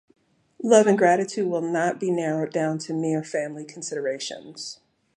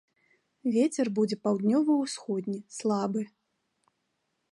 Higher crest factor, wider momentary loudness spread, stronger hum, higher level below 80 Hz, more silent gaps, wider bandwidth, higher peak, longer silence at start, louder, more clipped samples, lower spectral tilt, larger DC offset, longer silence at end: first, 22 dB vs 16 dB; first, 17 LU vs 10 LU; neither; about the same, -76 dBFS vs -78 dBFS; neither; about the same, 11 kHz vs 11.5 kHz; first, -2 dBFS vs -14 dBFS; about the same, 0.6 s vs 0.65 s; first, -24 LUFS vs -29 LUFS; neither; about the same, -5 dB/octave vs -6 dB/octave; neither; second, 0.4 s vs 1.25 s